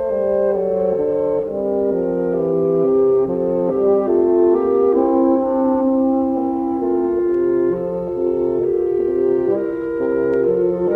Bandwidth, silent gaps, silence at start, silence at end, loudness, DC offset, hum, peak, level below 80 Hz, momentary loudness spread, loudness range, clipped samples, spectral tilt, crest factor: 3 kHz; none; 0 s; 0 s; -18 LUFS; under 0.1%; none; -6 dBFS; -48 dBFS; 5 LU; 3 LU; under 0.1%; -11 dB/octave; 12 dB